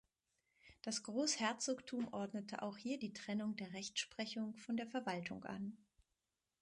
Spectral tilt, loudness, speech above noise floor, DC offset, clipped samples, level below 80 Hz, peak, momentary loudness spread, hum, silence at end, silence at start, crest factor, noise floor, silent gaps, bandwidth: -3 dB/octave; -43 LUFS; 46 dB; under 0.1%; under 0.1%; -82 dBFS; -24 dBFS; 9 LU; none; 0.85 s; 0.65 s; 22 dB; -90 dBFS; none; 11.5 kHz